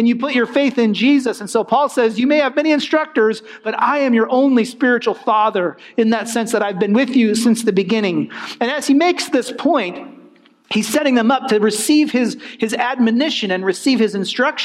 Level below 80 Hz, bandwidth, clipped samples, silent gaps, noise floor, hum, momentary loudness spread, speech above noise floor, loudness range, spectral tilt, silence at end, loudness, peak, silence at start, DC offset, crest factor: -70 dBFS; 15 kHz; under 0.1%; none; -48 dBFS; none; 6 LU; 32 dB; 2 LU; -4.5 dB/octave; 0 s; -16 LUFS; -2 dBFS; 0 s; under 0.1%; 14 dB